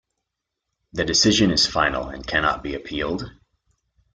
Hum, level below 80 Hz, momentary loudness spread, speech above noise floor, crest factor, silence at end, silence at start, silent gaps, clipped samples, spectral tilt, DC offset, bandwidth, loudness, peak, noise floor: none; -44 dBFS; 13 LU; 60 dB; 18 dB; 0.85 s; 0.95 s; none; under 0.1%; -3 dB/octave; under 0.1%; 11 kHz; -21 LUFS; -6 dBFS; -81 dBFS